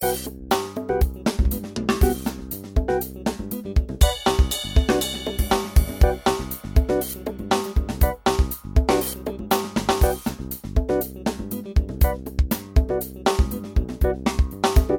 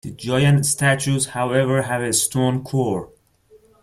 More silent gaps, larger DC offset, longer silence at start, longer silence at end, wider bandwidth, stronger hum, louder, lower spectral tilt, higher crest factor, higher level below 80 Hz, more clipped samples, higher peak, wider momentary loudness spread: neither; neither; about the same, 0 s vs 0.05 s; second, 0 s vs 0.75 s; first, 18.5 kHz vs 15.5 kHz; neither; second, -23 LUFS vs -19 LUFS; about the same, -5.5 dB/octave vs -4.5 dB/octave; about the same, 20 dB vs 16 dB; first, -24 dBFS vs -52 dBFS; neither; about the same, -2 dBFS vs -4 dBFS; about the same, 8 LU vs 6 LU